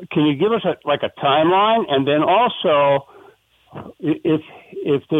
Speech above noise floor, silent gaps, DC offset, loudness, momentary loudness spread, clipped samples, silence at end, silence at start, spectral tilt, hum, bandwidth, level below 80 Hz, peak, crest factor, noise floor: 33 dB; none; under 0.1%; -18 LUFS; 11 LU; under 0.1%; 0 s; 0 s; -8 dB/octave; none; 3.9 kHz; -62 dBFS; -4 dBFS; 14 dB; -51 dBFS